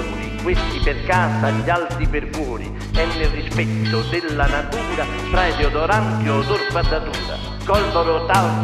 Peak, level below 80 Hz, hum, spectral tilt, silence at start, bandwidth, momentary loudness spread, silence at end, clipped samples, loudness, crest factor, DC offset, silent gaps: 0 dBFS; -26 dBFS; none; -6 dB/octave; 0 s; 14 kHz; 8 LU; 0 s; under 0.1%; -20 LUFS; 18 dB; under 0.1%; none